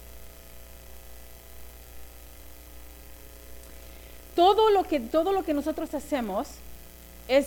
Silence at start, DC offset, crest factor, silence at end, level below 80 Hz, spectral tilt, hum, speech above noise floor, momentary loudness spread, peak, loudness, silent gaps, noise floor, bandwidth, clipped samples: 0 s; under 0.1%; 20 dB; 0 s; -50 dBFS; -4.5 dB/octave; none; 22 dB; 25 LU; -10 dBFS; -25 LUFS; none; -46 dBFS; 18 kHz; under 0.1%